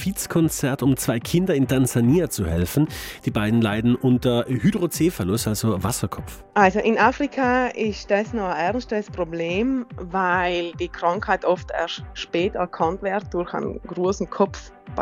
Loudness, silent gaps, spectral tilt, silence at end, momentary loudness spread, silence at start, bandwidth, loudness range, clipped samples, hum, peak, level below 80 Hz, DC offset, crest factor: -22 LUFS; none; -5.5 dB/octave; 0 s; 9 LU; 0 s; 16.5 kHz; 4 LU; under 0.1%; none; 0 dBFS; -42 dBFS; under 0.1%; 22 dB